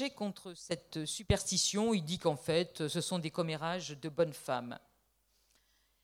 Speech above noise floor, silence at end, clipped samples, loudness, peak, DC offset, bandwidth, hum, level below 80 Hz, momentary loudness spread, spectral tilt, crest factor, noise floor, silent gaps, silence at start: 39 dB; 1.25 s; under 0.1%; -35 LUFS; -16 dBFS; under 0.1%; 16.5 kHz; none; -54 dBFS; 11 LU; -4 dB/octave; 20 dB; -75 dBFS; none; 0 s